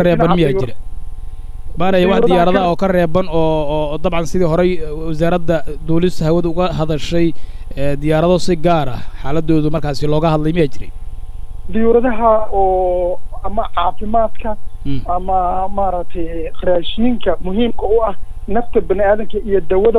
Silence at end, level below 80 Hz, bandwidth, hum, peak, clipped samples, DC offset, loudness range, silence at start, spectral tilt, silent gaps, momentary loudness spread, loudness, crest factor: 0 s; -26 dBFS; 12 kHz; none; -2 dBFS; under 0.1%; under 0.1%; 4 LU; 0 s; -7 dB/octave; none; 14 LU; -16 LUFS; 12 dB